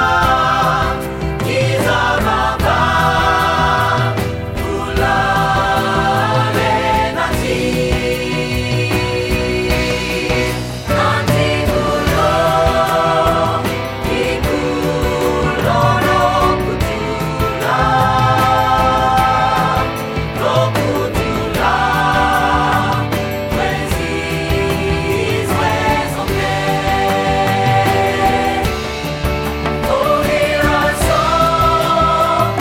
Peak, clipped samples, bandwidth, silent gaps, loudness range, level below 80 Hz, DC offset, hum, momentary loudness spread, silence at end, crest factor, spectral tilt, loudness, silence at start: 0 dBFS; under 0.1%; 18 kHz; none; 2 LU; -28 dBFS; under 0.1%; none; 6 LU; 0 s; 14 dB; -5 dB/octave; -15 LUFS; 0 s